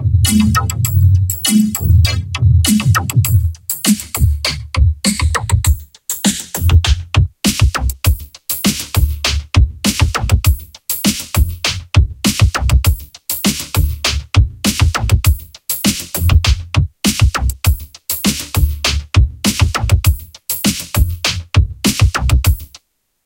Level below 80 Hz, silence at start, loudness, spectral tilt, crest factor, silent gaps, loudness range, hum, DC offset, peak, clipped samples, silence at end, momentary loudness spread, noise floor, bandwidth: -20 dBFS; 0 s; -15 LUFS; -4 dB/octave; 14 dB; none; 2 LU; none; under 0.1%; 0 dBFS; under 0.1%; 0.6 s; 5 LU; -48 dBFS; 17.5 kHz